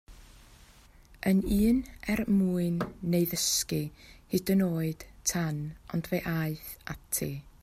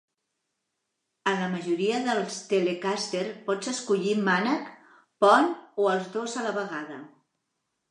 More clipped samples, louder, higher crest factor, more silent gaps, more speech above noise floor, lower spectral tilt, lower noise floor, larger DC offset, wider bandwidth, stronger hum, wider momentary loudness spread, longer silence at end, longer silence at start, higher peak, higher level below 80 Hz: neither; second, -30 LUFS vs -27 LUFS; second, 16 dB vs 22 dB; neither; second, 27 dB vs 55 dB; about the same, -5 dB/octave vs -4.5 dB/octave; second, -56 dBFS vs -81 dBFS; neither; first, 16 kHz vs 11 kHz; neither; about the same, 10 LU vs 10 LU; second, 0.15 s vs 0.85 s; second, 0.1 s vs 1.25 s; second, -16 dBFS vs -6 dBFS; first, -48 dBFS vs -82 dBFS